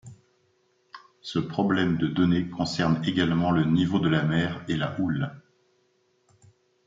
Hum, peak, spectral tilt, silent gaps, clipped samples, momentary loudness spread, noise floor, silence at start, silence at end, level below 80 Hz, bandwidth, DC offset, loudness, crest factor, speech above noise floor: none; -10 dBFS; -7 dB/octave; none; under 0.1%; 7 LU; -68 dBFS; 0.05 s; 1.5 s; -58 dBFS; 7.6 kHz; under 0.1%; -25 LUFS; 18 dB; 44 dB